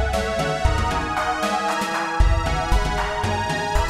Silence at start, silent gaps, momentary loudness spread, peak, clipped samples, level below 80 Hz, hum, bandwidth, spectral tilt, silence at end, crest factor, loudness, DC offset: 0 s; none; 2 LU; -4 dBFS; under 0.1%; -26 dBFS; none; 14.5 kHz; -4.5 dB/octave; 0 s; 16 dB; -22 LUFS; under 0.1%